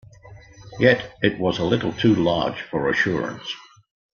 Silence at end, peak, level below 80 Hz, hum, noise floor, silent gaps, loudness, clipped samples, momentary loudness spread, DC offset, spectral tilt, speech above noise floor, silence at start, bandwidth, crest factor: 0.55 s; -2 dBFS; -52 dBFS; none; -45 dBFS; none; -21 LUFS; under 0.1%; 14 LU; under 0.1%; -6.5 dB/octave; 24 dB; 0.25 s; 7 kHz; 20 dB